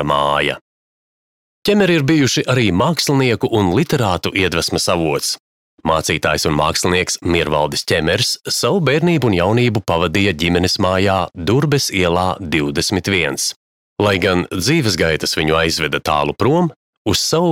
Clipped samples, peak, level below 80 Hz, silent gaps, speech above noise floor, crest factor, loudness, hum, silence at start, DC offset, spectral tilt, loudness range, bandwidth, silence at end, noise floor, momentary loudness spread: under 0.1%; -2 dBFS; -40 dBFS; 0.61-1.62 s, 5.40-5.78 s, 13.56-13.96 s, 16.76-17.05 s; over 74 dB; 16 dB; -16 LUFS; none; 0 s; under 0.1%; -4.5 dB/octave; 2 LU; 17 kHz; 0 s; under -90 dBFS; 4 LU